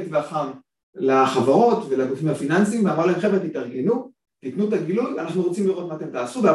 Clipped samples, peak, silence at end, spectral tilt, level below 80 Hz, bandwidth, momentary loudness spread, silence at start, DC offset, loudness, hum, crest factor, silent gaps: under 0.1%; -4 dBFS; 0 s; -6.5 dB/octave; -66 dBFS; 12 kHz; 11 LU; 0 s; under 0.1%; -22 LUFS; none; 16 dB; 0.83-0.93 s